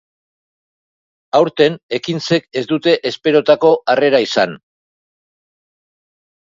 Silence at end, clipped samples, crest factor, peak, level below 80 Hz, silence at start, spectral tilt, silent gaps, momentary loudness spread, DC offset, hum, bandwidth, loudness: 1.95 s; under 0.1%; 18 dB; 0 dBFS; -64 dBFS; 1.35 s; -5 dB/octave; 1.83-1.89 s; 8 LU; under 0.1%; none; 7.6 kHz; -15 LUFS